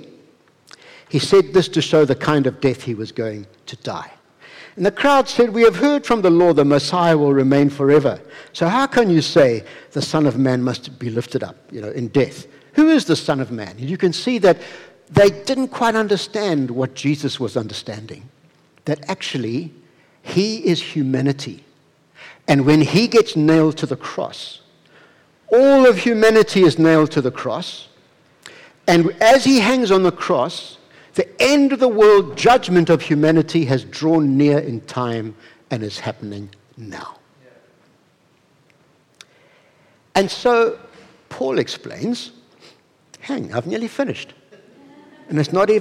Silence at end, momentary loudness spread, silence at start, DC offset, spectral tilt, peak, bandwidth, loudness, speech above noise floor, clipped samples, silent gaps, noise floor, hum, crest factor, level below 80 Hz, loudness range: 0 s; 17 LU; 1.15 s; under 0.1%; -6 dB/octave; -4 dBFS; 16 kHz; -17 LUFS; 41 dB; under 0.1%; none; -58 dBFS; none; 12 dB; -54 dBFS; 10 LU